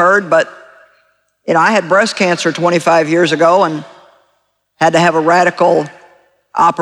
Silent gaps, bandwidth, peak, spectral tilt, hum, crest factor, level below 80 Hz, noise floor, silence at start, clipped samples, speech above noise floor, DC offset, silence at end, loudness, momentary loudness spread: none; 12 kHz; 0 dBFS; -4.5 dB/octave; none; 12 dB; -60 dBFS; -62 dBFS; 0 s; under 0.1%; 51 dB; under 0.1%; 0 s; -12 LUFS; 8 LU